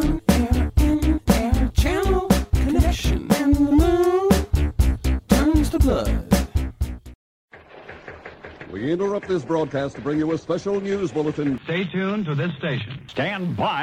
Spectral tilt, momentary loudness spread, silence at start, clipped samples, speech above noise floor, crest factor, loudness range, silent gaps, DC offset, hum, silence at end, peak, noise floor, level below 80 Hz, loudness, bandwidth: -6.5 dB/octave; 12 LU; 0 s; under 0.1%; 18 dB; 16 dB; 8 LU; 7.15-7.48 s; under 0.1%; none; 0 s; -4 dBFS; -42 dBFS; -26 dBFS; -22 LUFS; 16 kHz